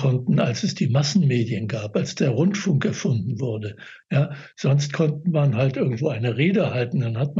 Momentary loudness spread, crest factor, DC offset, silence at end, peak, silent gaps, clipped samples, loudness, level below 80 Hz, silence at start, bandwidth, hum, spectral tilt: 7 LU; 14 dB; under 0.1%; 0 s; -8 dBFS; none; under 0.1%; -22 LUFS; -68 dBFS; 0 s; 7.8 kHz; none; -6.5 dB/octave